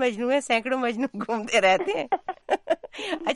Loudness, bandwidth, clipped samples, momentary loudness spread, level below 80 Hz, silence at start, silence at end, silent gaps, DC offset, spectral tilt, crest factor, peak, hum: -25 LUFS; 11.5 kHz; under 0.1%; 9 LU; -64 dBFS; 0 s; 0 s; none; under 0.1%; -3.5 dB/octave; 16 dB; -10 dBFS; none